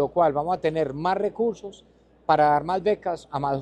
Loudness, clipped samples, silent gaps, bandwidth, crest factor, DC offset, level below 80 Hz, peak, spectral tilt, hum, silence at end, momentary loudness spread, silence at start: -24 LUFS; under 0.1%; none; 9.8 kHz; 18 dB; under 0.1%; -56 dBFS; -6 dBFS; -7 dB/octave; none; 0 s; 10 LU; 0 s